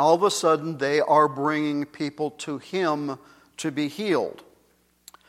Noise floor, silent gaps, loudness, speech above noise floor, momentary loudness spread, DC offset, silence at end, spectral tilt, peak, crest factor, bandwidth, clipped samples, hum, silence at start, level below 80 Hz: -63 dBFS; none; -24 LUFS; 40 dB; 13 LU; under 0.1%; 0.9 s; -4.5 dB/octave; -6 dBFS; 18 dB; 15.5 kHz; under 0.1%; none; 0 s; -72 dBFS